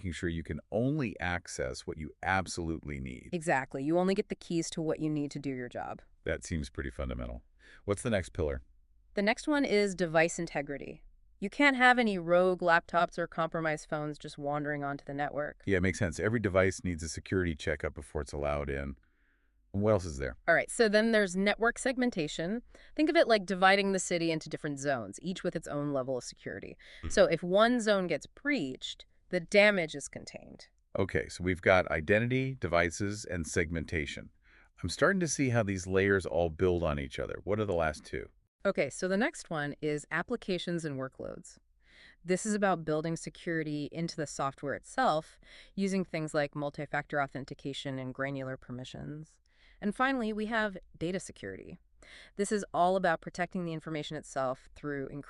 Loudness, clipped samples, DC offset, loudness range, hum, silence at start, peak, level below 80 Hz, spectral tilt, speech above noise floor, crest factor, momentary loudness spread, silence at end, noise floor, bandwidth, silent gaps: -32 LUFS; under 0.1%; under 0.1%; 7 LU; none; 0 s; -10 dBFS; -54 dBFS; -5 dB/octave; 38 dB; 22 dB; 15 LU; 0 s; -70 dBFS; 12 kHz; 38.48-38.59 s